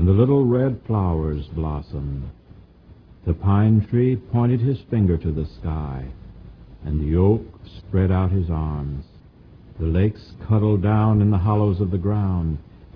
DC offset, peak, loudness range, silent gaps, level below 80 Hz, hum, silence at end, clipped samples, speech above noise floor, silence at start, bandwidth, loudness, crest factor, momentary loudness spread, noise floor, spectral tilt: under 0.1%; -4 dBFS; 3 LU; none; -34 dBFS; none; 0.1 s; under 0.1%; 28 dB; 0 s; 5 kHz; -21 LUFS; 16 dB; 15 LU; -47 dBFS; -12 dB/octave